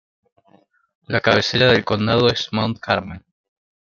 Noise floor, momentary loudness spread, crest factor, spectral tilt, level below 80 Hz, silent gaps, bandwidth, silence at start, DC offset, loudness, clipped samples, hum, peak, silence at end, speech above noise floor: -57 dBFS; 9 LU; 20 dB; -5.5 dB/octave; -52 dBFS; none; 7.2 kHz; 1.1 s; under 0.1%; -18 LUFS; under 0.1%; none; -2 dBFS; 0.75 s; 39 dB